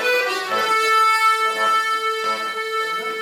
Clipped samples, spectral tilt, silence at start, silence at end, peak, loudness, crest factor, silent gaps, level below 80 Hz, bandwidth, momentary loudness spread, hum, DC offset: under 0.1%; 0 dB/octave; 0 s; 0 s; -6 dBFS; -18 LUFS; 14 dB; none; -78 dBFS; 16.5 kHz; 8 LU; none; under 0.1%